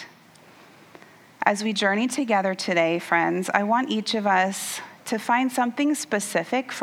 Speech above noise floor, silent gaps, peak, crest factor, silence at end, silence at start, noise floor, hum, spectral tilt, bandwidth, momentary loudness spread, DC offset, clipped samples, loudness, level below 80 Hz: 28 dB; none; -2 dBFS; 22 dB; 0 s; 0 s; -51 dBFS; none; -3.5 dB/octave; 17.5 kHz; 7 LU; under 0.1%; under 0.1%; -23 LUFS; -80 dBFS